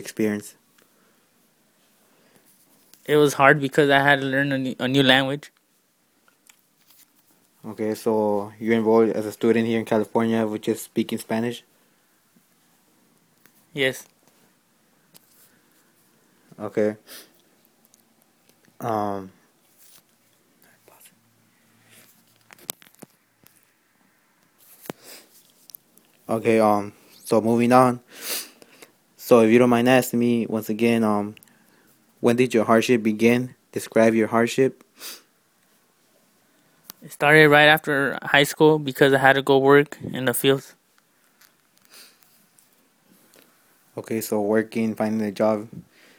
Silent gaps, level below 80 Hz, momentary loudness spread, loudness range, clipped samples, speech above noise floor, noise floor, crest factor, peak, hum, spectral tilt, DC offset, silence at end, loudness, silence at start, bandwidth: none; -66 dBFS; 22 LU; 15 LU; under 0.1%; 45 dB; -65 dBFS; 24 dB; 0 dBFS; none; -5 dB/octave; under 0.1%; 0.35 s; -20 LUFS; 0 s; 19.5 kHz